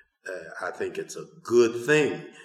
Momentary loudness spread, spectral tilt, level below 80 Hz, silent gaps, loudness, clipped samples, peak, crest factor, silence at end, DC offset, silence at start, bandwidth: 17 LU; -5 dB/octave; -78 dBFS; none; -25 LUFS; under 0.1%; -8 dBFS; 18 dB; 0 s; under 0.1%; 0.25 s; 13 kHz